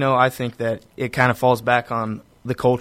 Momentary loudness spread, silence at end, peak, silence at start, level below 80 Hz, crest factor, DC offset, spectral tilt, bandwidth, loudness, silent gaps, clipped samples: 11 LU; 0 s; -2 dBFS; 0 s; -52 dBFS; 18 dB; under 0.1%; -6.5 dB/octave; 16 kHz; -21 LUFS; none; under 0.1%